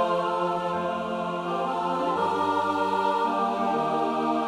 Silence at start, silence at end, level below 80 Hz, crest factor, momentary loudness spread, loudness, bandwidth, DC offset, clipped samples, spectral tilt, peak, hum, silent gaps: 0 s; 0 s; -66 dBFS; 14 dB; 4 LU; -26 LUFS; 13.5 kHz; under 0.1%; under 0.1%; -6 dB/octave; -12 dBFS; none; none